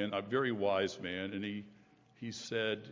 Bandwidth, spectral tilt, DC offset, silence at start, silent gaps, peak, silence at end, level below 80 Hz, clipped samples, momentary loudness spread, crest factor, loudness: 7.6 kHz; -5 dB/octave; under 0.1%; 0 s; none; -18 dBFS; 0 s; -70 dBFS; under 0.1%; 12 LU; 18 dB; -36 LUFS